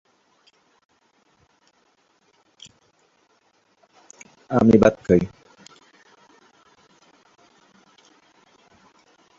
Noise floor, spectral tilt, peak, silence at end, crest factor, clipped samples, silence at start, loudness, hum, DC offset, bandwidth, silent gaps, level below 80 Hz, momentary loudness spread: -64 dBFS; -7.5 dB/octave; -2 dBFS; 4.1 s; 24 dB; under 0.1%; 4.5 s; -18 LUFS; none; under 0.1%; 7.8 kHz; none; -52 dBFS; 32 LU